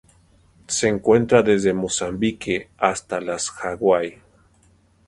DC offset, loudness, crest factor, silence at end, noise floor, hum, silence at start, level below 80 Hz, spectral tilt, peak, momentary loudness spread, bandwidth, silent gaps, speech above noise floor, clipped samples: under 0.1%; -21 LUFS; 22 dB; 0.95 s; -57 dBFS; none; 0.7 s; -52 dBFS; -4.5 dB/octave; 0 dBFS; 10 LU; 11.5 kHz; none; 37 dB; under 0.1%